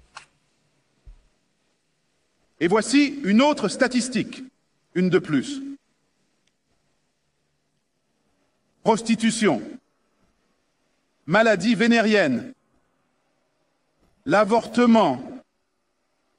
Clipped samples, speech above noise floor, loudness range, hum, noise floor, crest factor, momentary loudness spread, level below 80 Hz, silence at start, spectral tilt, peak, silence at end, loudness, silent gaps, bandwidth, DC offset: under 0.1%; 54 dB; 7 LU; none; -74 dBFS; 20 dB; 16 LU; -62 dBFS; 0.15 s; -5 dB/octave; -4 dBFS; 1 s; -21 LUFS; none; 11 kHz; under 0.1%